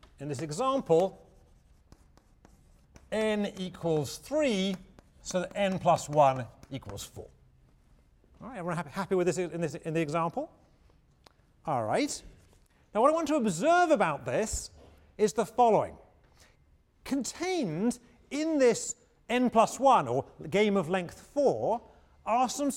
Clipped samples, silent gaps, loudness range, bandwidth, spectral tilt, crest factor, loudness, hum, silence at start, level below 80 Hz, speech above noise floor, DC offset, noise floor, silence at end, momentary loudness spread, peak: under 0.1%; none; 7 LU; 16.5 kHz; -5 dB/octave; 20 dB; -29 LUFS; none; 0.2 s; -58 dBFS; 36 dB; under 0.1%; -64 dBFS; 0 s; 16 LU; -10 dBFS